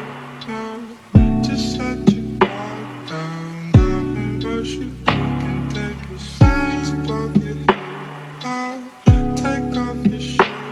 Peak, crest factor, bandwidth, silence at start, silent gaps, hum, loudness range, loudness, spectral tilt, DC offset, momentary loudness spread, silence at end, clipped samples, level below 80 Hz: 0 dBFS; 18 dB; 12 kHz; 0 s; none; none; 2 LU; -19 LUFS; -7 dB/octave; under 0.1%; 15 LU; 0 s; under 0.1%; -28 dBFS